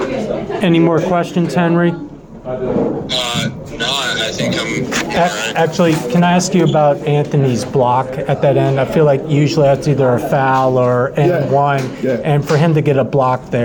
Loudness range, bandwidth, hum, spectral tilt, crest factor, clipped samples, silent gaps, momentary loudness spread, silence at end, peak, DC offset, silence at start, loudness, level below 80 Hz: 4 LU; 19 kHz; none; -6 dB/octave; 12 dB; under 0.1%; none; 6 LU; 0 s; -2 dBFS; under 0.1%; 0 s; -14 LUFS; -44 dBFS